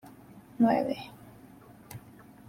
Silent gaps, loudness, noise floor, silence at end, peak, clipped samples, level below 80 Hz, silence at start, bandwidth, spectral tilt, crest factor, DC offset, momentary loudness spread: none; -28 LUFS; -53 dBFS; 0.5 s; -14 dBFS; under 0.1%; -68 dBFS; 0.35 s; 16 kHz; -7 dB/octave; 20 dB; under 0.1%; 26 LU